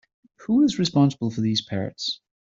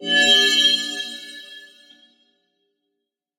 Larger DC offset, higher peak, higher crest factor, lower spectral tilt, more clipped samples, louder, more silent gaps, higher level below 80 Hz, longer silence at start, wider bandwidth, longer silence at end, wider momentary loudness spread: neither; second, -8 dBFS vs -4 dBFS; about the same, 16 dB vs 18 dB; first, -6 dB/octave vs 0.5 dB/octave; neither; second, -23 LUFS vs -15 LUFS; neither; first, -62 dBFS vs -68 dBFS; first, 0.4 s vs 0 s; second, 7.8 kHz vs 16 kHz; second, 0.25 s vs 1.75 s; second, 9 LU vs 23 LU